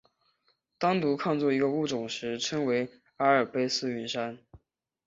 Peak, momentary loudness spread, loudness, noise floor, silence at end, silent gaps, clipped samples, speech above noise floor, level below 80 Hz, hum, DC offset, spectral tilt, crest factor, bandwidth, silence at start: -10 dBFS; 8 LU; -29 LUFS; -73 dBFS; 0.5 s; none; under 0.1%; 45 dB; -70 dBFS; none; under 0.1%; -4.5 dB/octave; 20 dB; 7.8 kHz; 0.8 s